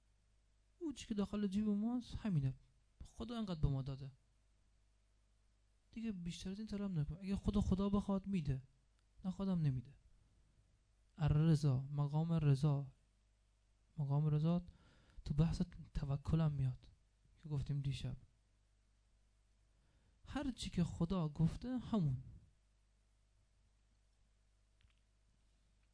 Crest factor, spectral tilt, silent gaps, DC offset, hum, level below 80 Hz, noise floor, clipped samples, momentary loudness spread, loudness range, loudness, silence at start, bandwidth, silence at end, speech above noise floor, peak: 20 dB; -8 dB/octave; none; under 0.1%; 50 Hz at -65 dBFS; -56 dBFS; -75 dBFS; under 0.1%; 13 LU; 9 LU; -40 LUFS; 0.8 s; 10.5 kHz; 3.55 s; 36 dB; -22 dBFS